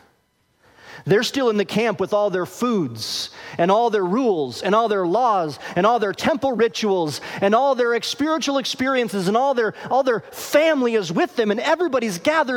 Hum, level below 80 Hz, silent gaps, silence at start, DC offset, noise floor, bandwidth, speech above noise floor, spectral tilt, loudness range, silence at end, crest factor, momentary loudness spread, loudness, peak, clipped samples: none; -62 dBFS; none; 0.85 s; under 0.1%; -64 dBFS; 17.5 kHz; 45 dB; -4.5 dB/octave; 1 LU; 0 s; 16 dB; 5 LU; -20 LUFS; -4 dBFS; under 0.1%